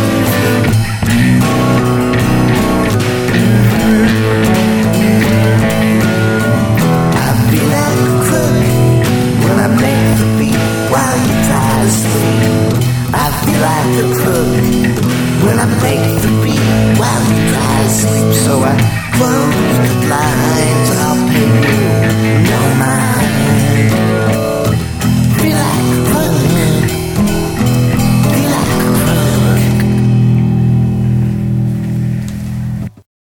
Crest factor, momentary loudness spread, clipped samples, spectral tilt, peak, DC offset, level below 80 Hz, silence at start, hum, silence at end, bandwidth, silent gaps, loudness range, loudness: 10 dB; 3 LU; under 0.1%; -6 dB/octave; 0 dBFS; under 0.1%; -30 dBFS; 0 s; none; 0.3 s; 19 kHz; none; 1 LU; -11 LUFS